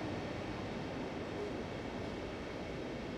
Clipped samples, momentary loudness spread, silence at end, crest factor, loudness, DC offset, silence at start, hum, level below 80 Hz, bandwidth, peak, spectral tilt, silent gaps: under 0.1%; 2 LU; 0 s; 12 dB; -42 LUFS; under 0.1%; 0 s; none; -56 dBFS; 14 kHz; -30 dBFS; -6 dB/octave; none